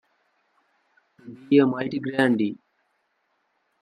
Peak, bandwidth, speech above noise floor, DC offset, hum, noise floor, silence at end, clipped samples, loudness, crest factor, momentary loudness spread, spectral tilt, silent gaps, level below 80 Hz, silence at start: -6 dBFS; 10 kHz; 50 dB; under 0.1%; none; -72 dBFS; 1.25 s; under 0.1%; -22 LUFS; 22 dB; 24 LU; -7.5 dB/octave; none; -72 dBFS; 1.25 s